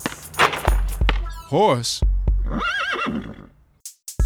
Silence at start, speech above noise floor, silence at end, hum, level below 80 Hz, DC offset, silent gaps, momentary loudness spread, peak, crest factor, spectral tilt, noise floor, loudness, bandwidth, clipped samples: 0 s; 23 dB; 0 s; none; -24 dBFS; under 0.1%; none; 16 LU; 0 dBFS; 20 dB; -4.5 dB/octave; -44 dBFS; -22 LUFS; 17.5 kHz; under 0.1%